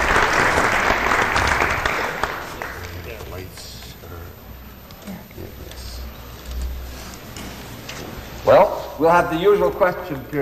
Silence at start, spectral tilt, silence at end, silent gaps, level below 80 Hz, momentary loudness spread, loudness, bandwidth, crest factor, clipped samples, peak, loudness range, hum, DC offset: 0 s; -4.5 dB/octave; 0 s; none; -36 dBFS; 20 LU; -18 LUFS; 15 kHz; 18 dB; under 0.1%; -4 dBFS; 16 LU; none; under 0.1%